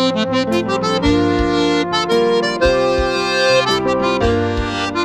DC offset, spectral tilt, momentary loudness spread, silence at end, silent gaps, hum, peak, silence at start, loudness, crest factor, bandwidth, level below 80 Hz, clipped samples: under 0.1%; -5 dB/octave; 4 LU; 0 s; none; none; -2 dBFS; 0 s; -16 LUFS; 14 dB; 13.5 kHz; -32 dBFS; under 0.1%